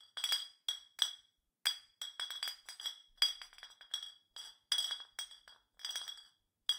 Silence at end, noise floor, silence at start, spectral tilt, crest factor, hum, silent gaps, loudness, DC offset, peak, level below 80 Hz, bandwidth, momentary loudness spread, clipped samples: 0 s; -69 dBFS; 0 s; 5 dB/octave; 28 dB; none; none; -39 LUFS; under 0.1%; -14 dBFS; -84 dBFS; 18 kHz; 17 LU; under 0.1%